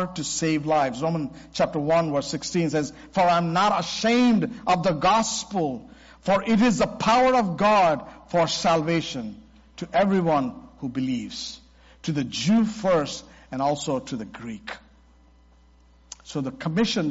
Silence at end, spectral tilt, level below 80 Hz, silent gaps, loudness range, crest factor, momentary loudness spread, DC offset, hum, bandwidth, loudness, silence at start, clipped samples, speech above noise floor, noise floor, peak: 0 s; -4.5 dB/octave; -54 dBFS; none; 7 LU; 12 dB; 15 LU; under 0.1%; none; 8 kHz; -23 LUFS; 0 s; under 0.1%; 32 dB; -55 dBFS; -12 dBFS